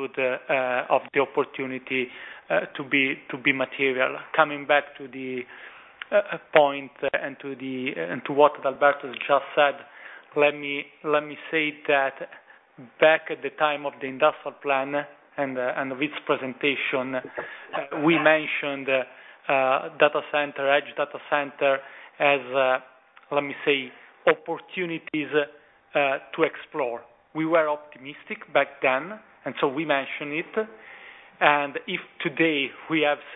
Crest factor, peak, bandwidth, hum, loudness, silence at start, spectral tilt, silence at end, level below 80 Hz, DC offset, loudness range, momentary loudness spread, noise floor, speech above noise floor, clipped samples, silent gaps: 24 dB; 0 dBFS; 4 kHz; none; -25 LUFS; 0 s; -7.5 dB/octave; 0 s; -74 dBFS; under 0.1%; 3 LU; 14 LU; -47 dBFS; 22 dB; under 0.1%; none